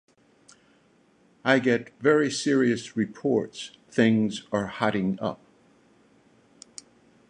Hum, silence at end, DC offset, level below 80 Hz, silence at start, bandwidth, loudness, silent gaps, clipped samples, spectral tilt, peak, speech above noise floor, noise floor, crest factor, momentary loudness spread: none; 1.95 s; under 0.1%; -66 dBFS; 1.45 s; 10.5 kHz; -25 LUFS; none; under 0.1%; -5.5 dB/octave; -6 dBFS; 37 dB; -62 dBFS; 22 dB; 20 LU